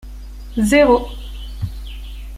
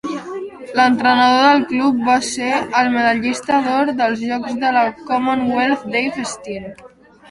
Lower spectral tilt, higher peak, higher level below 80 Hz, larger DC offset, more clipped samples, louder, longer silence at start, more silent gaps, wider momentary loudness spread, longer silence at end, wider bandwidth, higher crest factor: first, -5.5 dB/octave vs -3.5 dB/octave; about the same, -2 dBFS vs 0 dBFS; first, -30 dBFS vs -56 dBFS; neither; neither; about the same, -17 LUFS vs -16 LUFS; about the same, 0.05 s vs 0.05 s; neither; first, 22 LU vs 14 LU; second, 0 s vs 0.45 s; first, 16 kHz vs 11.5 kHz; about the same, 18 dB vs 16 dB